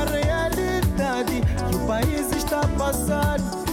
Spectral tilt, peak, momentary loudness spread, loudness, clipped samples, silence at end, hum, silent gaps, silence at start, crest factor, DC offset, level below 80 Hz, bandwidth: -5.5 dB/octave; -12 dBFS; 1 LU; -23 LUFS; under 0.1%; 0 s; none; none; 0 s; 10 dB; under 0.1%; -30 dBFS; 18 kHz